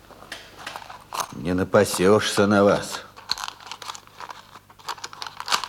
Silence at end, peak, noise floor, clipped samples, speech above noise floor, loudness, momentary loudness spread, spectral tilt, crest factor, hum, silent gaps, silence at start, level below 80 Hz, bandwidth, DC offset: 0 s; -4 dBFS; -47 dBFS; under 0.1%; 28 dB; -22 LUFS; 20 LU; -4 dB/octave; 20 dB; none; none; 0.1 s; -58 dBFS; 17 kHz; under 0.1%